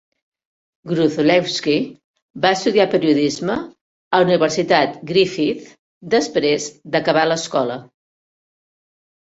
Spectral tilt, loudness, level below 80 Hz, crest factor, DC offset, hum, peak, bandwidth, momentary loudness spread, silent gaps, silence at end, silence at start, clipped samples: -4.5 dB/octave; -18 LUFS; -60 dBFS; 18 dB; under 0.1%; none; -2 dBFS; 8 kHz; 8 LU; 2.04-2.14 s, 2.22-2.34 s, 3.81-4.11 s, 5.79-6.01 s; 1.5 s; 0.85 s; under 0.1%